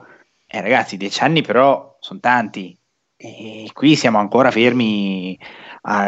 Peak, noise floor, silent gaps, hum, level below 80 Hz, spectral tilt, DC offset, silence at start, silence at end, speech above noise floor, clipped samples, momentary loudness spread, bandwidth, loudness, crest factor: 0 dBFS; -49 dBFS; none; none; -68 dBFS; -5.5 dB/octave; under 0.1%; 0.55 s; 0 s; 32 dB; under 0.1%; 20 LU; 8.2 kHz; -16 LUFS; 16 dB